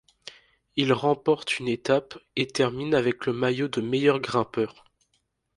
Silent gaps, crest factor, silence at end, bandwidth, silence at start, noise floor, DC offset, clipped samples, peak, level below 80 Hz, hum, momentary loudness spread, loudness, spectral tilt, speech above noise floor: none; 20 dB; 0.85 s; 11.5 kHz; 0.25 s; -73 dBFS; under 0.1%; under 0.1%; -6 dBFS; -64 dBFS; none; 9 LU; -25 LUFS; -5.5 dB/octave; 48 dB